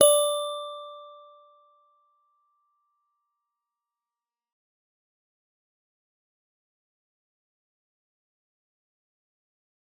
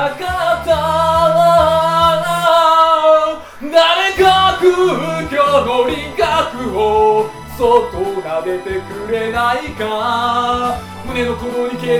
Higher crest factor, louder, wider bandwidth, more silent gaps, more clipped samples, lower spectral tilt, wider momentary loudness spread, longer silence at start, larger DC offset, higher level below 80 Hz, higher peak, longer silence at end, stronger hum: first, 30 dB vs 12 dB; second, -25 LUFS vs -14 LUFS; about the same, 18 kHz vs 18 kHz; neither; neither; second, 0.5 dB/octave vs -4.5 dB/octave; first, 25 LU vs 10 LU; about the same, 0 s vs 0 s; neither; second, -90 dBFS vs -38 dBFS; second, -4 dBFS vs 0 dBFS; first, 8.85 s vs 0 s; neither